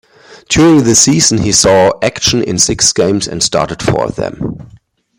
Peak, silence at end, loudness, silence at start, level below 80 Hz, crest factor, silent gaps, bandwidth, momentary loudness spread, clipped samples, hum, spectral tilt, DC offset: 0 dBFS; 0.55 s; -10 LUFS; 0.3 s; -36 dBFS; 12 dB; none; over 20 kHz; 12 LU; under 0.1%; none; -3.5 dB/octave; under 0.1%